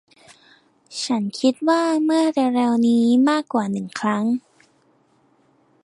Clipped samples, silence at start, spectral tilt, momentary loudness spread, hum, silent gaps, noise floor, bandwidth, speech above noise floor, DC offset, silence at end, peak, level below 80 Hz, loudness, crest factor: under 0.1%; 0.9 s; -5 dB/octave; 8 LU; none; none; -60 dBFS; 11.5 kHz; 41 dB; under 0.1%; 1.45 s; -6 dBFS; -72 dBFS; -20 LUFS; 16 dB